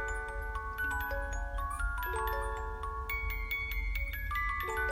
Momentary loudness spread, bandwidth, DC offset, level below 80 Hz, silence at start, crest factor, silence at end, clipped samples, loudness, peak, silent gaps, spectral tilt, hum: 5 LU; 16 kHz; under 0.1%; -38 dBFS; 0 s; 14 dB; 0 s; under 0.1%; -36 LUFS; -22 dBFS; none; -4 dB/octave; none